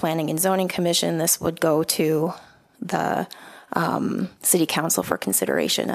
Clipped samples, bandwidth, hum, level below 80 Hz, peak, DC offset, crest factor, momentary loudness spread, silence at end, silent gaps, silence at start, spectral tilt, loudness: under 0.1%; 15.5 kHz; none; -60 dBFS; -2 dBFS; under 0.1%; 20 dB; 8 LU; 0 s; none; 0 s; -3.5 dB/octave; -22 LUFS